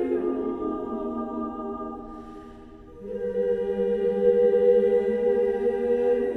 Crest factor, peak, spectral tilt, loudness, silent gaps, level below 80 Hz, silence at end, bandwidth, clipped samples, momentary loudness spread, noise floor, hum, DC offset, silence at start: 16 dB; -10 dBFS; -8.5 dB/octave; -25 LUFS; none; -52 dBFS; 0 s; 4.1 kHz; under 0.1%; 20 LU; -45 dBFS; none; under 0.1%; 0 s